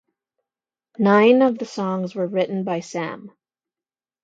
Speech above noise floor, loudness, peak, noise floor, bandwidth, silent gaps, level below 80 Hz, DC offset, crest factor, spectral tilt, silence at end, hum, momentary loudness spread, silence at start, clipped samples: over 71 dB; -20 LUFS; -2 dBFS; under -90 dBFS; 7.8 kHz; none; -74 dBFS; under 0.1%; 20 dB; -6.5 dB/octave; 0.95 s; none; 14 LU; 1 s; under 0.1%